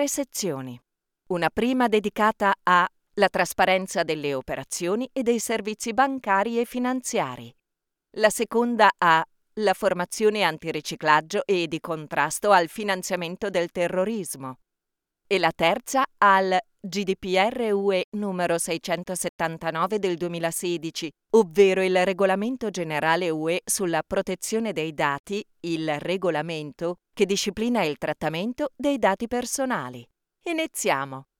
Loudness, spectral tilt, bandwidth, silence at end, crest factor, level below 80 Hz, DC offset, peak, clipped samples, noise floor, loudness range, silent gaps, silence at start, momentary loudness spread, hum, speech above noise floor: -24 LUFS; -4 dB/octave; 19 kHz; 0.2 s; 22 dB; -60 dBFS; under 0.1%; -4 dBFS; under 0.1%; -84 dBFS; 4 LU; 18.04-18.12 s, 19.29-19.39 s, 25.19-25.24 s; 0 s; 10 LU; none; 60 dB